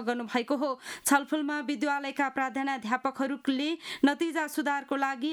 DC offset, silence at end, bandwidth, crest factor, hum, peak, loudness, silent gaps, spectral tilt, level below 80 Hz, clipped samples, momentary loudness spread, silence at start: under 0.1%; 0 s; 19.5 kHz; 20 dB; none; -10 dBFS; -30 LUFS; none; -2.5 dB/octave; -76 dBFS; under 0.1%; 5 LU; 0 s